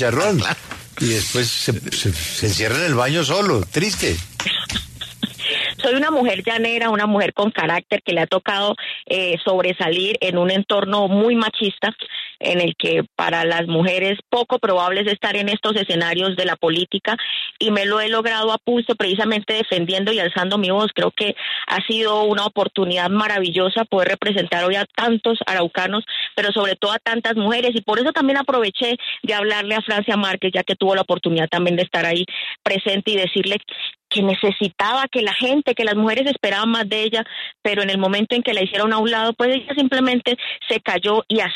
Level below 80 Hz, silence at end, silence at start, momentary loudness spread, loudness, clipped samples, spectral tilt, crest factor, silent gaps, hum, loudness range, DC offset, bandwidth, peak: -50 dBFS; 0 s; 0 s; 4 LU; -19 LUFS; under 0.1%; -4 dB/octave; 14 dB; none; none; 1 LU; under 0.1%; 13.5 kHz; -4 dBFS